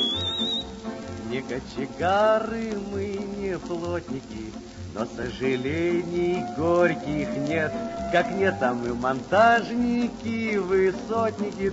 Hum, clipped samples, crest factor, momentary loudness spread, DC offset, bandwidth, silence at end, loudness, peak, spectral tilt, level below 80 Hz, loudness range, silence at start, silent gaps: none; under 0.1%; 20 dB; 12 LU; under 0.1%; 8 kHz; 0 s; -25 LUFS; -6 dBFS; -5.5 dB/octave; -50 dBFS; 6 LU; 0 s; none